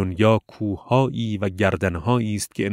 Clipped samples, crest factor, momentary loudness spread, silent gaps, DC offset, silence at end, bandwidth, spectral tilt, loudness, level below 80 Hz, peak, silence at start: under 0.1%; 18 dB; 7 LU; none; under 0.1%; 0 s; 16 kHz; -6.5 dB/octave; -22 LUFS; -48 dBFS; -4 dBFS; 0 s